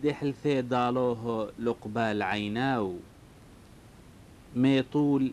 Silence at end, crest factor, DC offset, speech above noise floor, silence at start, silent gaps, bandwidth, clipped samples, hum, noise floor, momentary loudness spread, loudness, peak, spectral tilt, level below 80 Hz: 0 s; 16 dB; under 0.1%; 24 dB; 0 s; none; 11.5 kHz; under 0.1%; none; -52 dBFS; 8 LU; -29 LUFS; -12 dBFS; -7 dB/octave; -60 dBFS